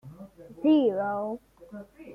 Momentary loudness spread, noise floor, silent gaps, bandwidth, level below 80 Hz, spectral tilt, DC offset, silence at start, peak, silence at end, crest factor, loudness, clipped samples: 25 LU; -47 dBFS; none; 4.9 kHz; -66 dBFS; -8 dB/octave; under 0.1%; 0.05 s; -14 dBFS; 0 s; 16 dB; -26 LUFS; under 0.1%